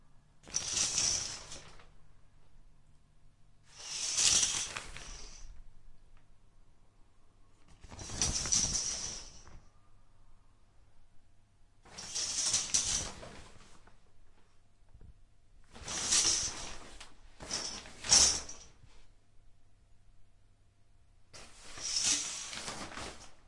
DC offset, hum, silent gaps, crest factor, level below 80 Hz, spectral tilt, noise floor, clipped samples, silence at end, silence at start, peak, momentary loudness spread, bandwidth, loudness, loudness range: under 0.1%; none; none; 30 dB; -56 dBFS; 0.5 dB/octave; -62 dBFS; under 0.1%; 0 s; 0.15 s; -8 dBFS; 26 LU; 11.5 kHz; -31 LUFS; 11 LU